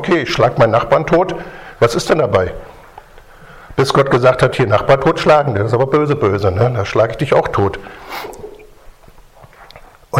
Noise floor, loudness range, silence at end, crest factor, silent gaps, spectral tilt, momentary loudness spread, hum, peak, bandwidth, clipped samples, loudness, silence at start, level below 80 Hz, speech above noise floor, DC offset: -42 dBFS; 5 LU; 0 s; 16 dB; none; -6 dB/octave; 16 LU; none; 0 dBFS; 16 kHz; under 0.1%; -14 LUFS; 0 s; -40 dBFS; 28 dB; under 0.1%